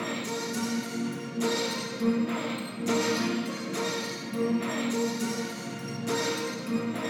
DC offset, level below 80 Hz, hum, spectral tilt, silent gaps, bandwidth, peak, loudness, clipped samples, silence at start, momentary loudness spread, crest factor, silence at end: under 0.1%; -76 dBFS; none; -4 dB/octave; none; 17.5 kHz; -14 dBFS; -30 LUFS; under 0.1%; 0 s; 6 LU; 16 dB; 0 s